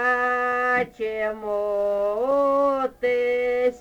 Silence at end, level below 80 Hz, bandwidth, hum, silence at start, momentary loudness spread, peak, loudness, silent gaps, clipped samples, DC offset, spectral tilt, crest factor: 0 s; -56 dBFS; 9.8 kHz; none; 0 s; 6 LU; -10 dBFS; -23 LUFS; none; under 0.1%; under 0.1%; -5 dB/octave; 14 dB